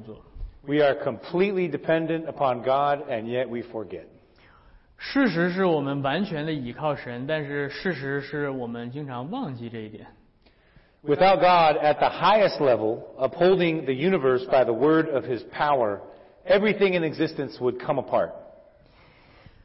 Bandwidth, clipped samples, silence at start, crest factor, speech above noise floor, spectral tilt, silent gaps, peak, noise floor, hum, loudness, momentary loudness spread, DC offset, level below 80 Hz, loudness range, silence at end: 5.8 kHz; under 0.1%; 0 s; 14 dB; 35 dB; -10 dB/octave; none; -10 dBFS; -59 dBFS; none; -24 LUFS; 15 LU; under 0.1%; -54 dBFS; 9 LU; 1.15 s